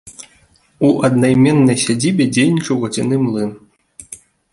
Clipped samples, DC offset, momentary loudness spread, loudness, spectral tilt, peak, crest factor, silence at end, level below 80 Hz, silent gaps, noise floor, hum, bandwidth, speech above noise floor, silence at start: under 0.1%; under 0.1%; 22 LU; -15 LUFS; -5.5 dB/octave; -2 dBFS; 14 dB; 0.4 s; -52 dBFS; none; -53 dBFS; none; 11.5 kHz; 39 dB; 0.05 s